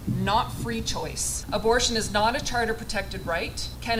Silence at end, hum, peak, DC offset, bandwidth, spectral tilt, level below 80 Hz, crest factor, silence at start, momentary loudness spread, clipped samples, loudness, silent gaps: 0 s; none; -10 dBFS; under 0.1%; 16.5 kHz; -3.5 dB/octave; -38 dBFS; 18 dB; 0 s; 8 LU; under 0.1%; -26 LUFS; none